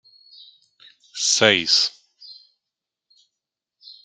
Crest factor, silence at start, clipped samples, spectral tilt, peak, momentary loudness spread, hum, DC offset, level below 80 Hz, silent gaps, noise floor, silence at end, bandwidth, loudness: 24 dB; 1.15 s; under 0.1%; -1 dB/octave; -2 dBFS; 9 LU; none; under 0.1%; -72 dBFS; none; -85 dBFS; 0.1 s; 12 kHz; -17 LUFS